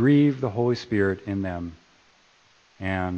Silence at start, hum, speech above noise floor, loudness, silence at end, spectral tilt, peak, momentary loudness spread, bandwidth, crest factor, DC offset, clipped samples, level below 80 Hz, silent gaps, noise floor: 0 s; none; 36 dB; -25 LUFS; 0 s; -8 dB/octave; -8 dBFS; 14 LU; 7 kHz; 16 dB; under 0.1%; under 0.1%; -56 dBFS; none; -59 dBFS